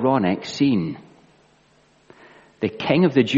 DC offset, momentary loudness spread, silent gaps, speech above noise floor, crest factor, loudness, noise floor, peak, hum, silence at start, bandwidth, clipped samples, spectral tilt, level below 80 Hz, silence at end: under 0.1%; 12 LU; none; 38 dB; 18 dB; -21 LUFS; -58 dBFS; -4 dBFS; none; 0 s; 7.8 kHz; under 0.1%; -6.5 dB/octave; -62 dBFS; 0 s